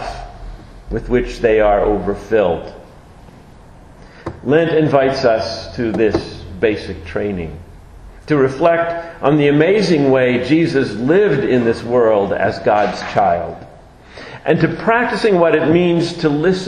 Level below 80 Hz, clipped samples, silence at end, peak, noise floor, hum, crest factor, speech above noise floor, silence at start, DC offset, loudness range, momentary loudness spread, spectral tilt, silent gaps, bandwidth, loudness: -38 dBFS; under 0.1%; 0 s; 0 dBFS; -40 dBFS; none; 16 dB; 26 dB; 0 s; under 0.1%; 5 LU; 14 LU; -7 dB/octave; none; 10.5 kHz; -15 LUFS